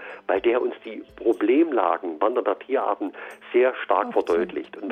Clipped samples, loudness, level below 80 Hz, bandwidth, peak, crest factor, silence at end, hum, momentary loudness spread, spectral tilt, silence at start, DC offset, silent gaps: under 0.1%; -23 LUFS; -64 dBFS; 8.8 kHz; -6 dBFS; 16 dB; 0 s; none; 11 LU; -6 dB/octave; 0 s; under 0.1%; none